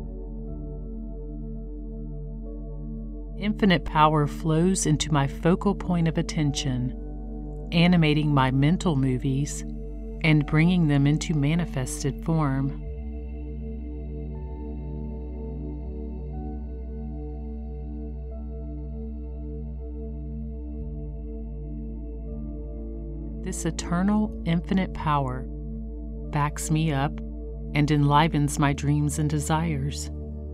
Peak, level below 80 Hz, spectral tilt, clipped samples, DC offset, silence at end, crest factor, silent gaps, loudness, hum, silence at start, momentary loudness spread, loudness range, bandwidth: -6 dBFS; -36 dBFS; -6 dB/octave; under 0.1%; under 0.1%; 0 s; 20 dB; none; -27 LUFS; none; 0 s; 16 LU; 13 LU; 14 kHz